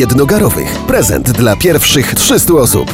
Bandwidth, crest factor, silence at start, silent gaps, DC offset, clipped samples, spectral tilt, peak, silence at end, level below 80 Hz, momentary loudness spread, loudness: 17.5 kHz; 10 dB; 0 s; none; under 0.1%; under 0.1%; -4 dB/octave; 0 dBFS; 0 s; -28 dBFS; 4 LU; -9 LUFS